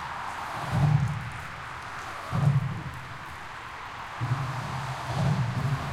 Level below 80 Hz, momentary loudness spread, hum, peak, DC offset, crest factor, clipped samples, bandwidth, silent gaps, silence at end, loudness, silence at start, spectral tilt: -50 dBFS; 13 LU; none; -12 dBFS; under 0.1%; 18 dB; under 0.1%; 13.5 kHz; none; 0 s; -30 LUFS; 0 s; -6.5 dB/octave